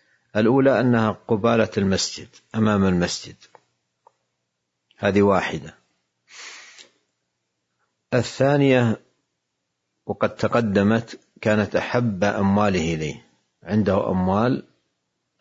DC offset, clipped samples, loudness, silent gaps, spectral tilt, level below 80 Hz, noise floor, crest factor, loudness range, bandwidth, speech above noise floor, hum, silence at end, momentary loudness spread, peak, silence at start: under 0.1%; under 0.1%; -21 LUFS; none; -6 dB/octave; -58 dBFS; -78 dBFS; 18 dB; 5 LU; 8 kHz; 57 dB; none; 0.8 s; 16 LU; -4 dBFS; 0.35 s